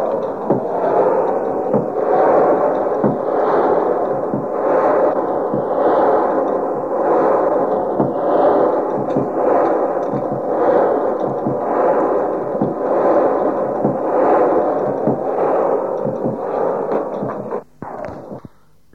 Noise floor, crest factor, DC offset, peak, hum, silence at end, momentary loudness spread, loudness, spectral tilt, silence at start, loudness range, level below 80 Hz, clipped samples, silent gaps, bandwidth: -43 dBFS; 14 dB; 0.4%; -2 dBFS; none; 0.45 s; 7 LU; -17 LUFS; -9 dB/octave; 0 s; 2 LU; -58 dBFS; under 0.1%; none; 6.4 kHz